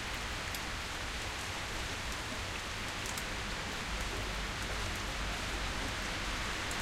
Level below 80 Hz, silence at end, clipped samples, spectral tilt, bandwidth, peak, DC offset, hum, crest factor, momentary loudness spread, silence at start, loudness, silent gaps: -44 dBFS; 0 s; under 0.1%; -2.5 dB/octave; 16 kHz; -20 dBFS; under 0.1%; none; 18 dB; 2 LU; 0 s; -37 LUFS; none